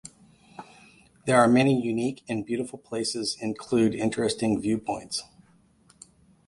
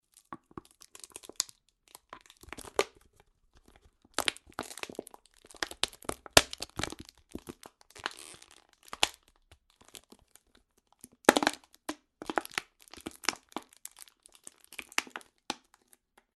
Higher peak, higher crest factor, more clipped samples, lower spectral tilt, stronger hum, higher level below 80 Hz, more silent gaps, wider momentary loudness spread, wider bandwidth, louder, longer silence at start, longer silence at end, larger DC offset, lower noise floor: second, -6 dBFS vs -2 dBFS; second, 22 dB vs 36 dB; neither; first, -5 dB/octave vs -1.5 dB/octave; neither; about the same, -60 dBFS vs -60 dBFS; neither; second, 14 LU vs 26 LU; about the same, 11.5 kHz vs 12.5 kHz; first, -26 LUFS vs -32 LUFS; second, 0.05 s vs 0.3 s; first, 1.25 s vs 0.85 s; neither; second, -60 dBFS vs -69 dBFS